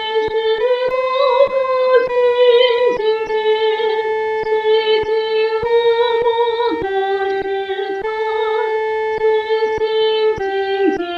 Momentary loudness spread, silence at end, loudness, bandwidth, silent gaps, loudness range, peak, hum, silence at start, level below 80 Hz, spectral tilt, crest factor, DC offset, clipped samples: 6 LU; 0 s; -16 LUFS; 6.4 kHz; none; 4 LU; -2 dBFS; none; 0 s; -50 dBFS; -4.5 dB/octave; 14 dB; under 0.1%; under 0.1%